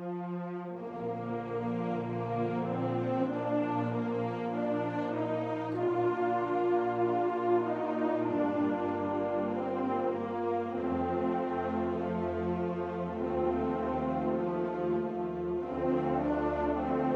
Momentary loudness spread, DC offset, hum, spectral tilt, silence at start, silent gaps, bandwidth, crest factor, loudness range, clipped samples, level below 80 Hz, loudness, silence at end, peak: 5 LU; under 0.1%; none; -9 dB/octave; 0 s; none; 6.4 kHz; 14 dB; 2 LU; under 0.1%; -56 dBFS; -32 LUFS; 0 s; -18 dBFS